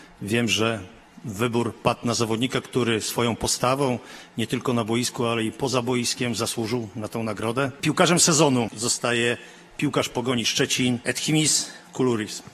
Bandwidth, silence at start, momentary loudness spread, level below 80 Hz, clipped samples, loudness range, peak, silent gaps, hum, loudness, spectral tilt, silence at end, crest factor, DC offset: 13.5 kHz; 0 s; 10 LU; -54 dBFS; under 0.1%; 4 LU; -4 dBFS; none; none; -23 LUFS; -3.5 dB/octave; 0.05 s; 20 dB; under 0.1%